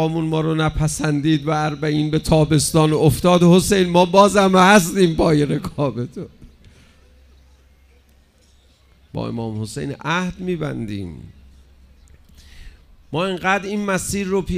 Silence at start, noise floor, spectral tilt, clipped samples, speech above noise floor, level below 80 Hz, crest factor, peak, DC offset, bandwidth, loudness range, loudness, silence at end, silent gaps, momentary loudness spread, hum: 0 s; -54 dBFS; -5.5 dB/octave; under 0.1%; 36 dB; -40 dBFS; 18 dB; 0 dBFS; under 0.1%; 16 kHz; 17 LU; -17 LUFS; 0 s; none; 15 LU; none